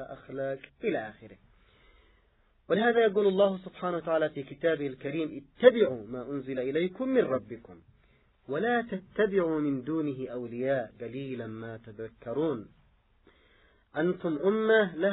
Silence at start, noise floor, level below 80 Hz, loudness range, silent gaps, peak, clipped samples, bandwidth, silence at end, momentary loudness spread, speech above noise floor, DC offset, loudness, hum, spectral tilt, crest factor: 0 s; -66 dBFS; -66 dBFS; 7 LU; none; -4 dBFS; under 0.1%; 4.1 kHz; 0 s; 15 LU; 37 dB; under 0.1%; -29 LUFS; none; -10 dB/octave; 26 dB